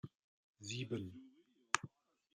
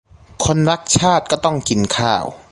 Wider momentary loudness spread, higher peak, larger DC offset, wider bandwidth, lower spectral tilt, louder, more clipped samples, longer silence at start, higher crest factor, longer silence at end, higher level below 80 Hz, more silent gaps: first, 18 LU vs 5 LU; second, -14 dBFS vs 0 dBFS; neither; about the same, 12 kHz vs 11.5 kHz; about the same, -3.5 dB/octave vs -4 dB/octave; second, -43 LUFS vs -16 LUFS; neither; second, 0.05 s vs 0.4 s; first, 34 dB vs 16 dB; first, 0.5 s vs 0.15 s; second, -82 dBFS vs -40 dBFS; first, 0.15-0.54 s vs none